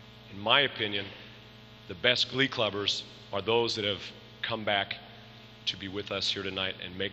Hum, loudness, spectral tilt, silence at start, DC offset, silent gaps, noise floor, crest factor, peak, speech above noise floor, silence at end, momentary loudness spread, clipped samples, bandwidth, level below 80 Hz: 60 Hz at -60 dBFS; -29 LUFS; -3.5 dB/octave; 0 s; under 0.1%; none; -51 dBFS; 24 dB; -8 dBFS; 20 dB; 0 s; 22 LU; under 0.1%; 13.5 kHz; -64 dBFS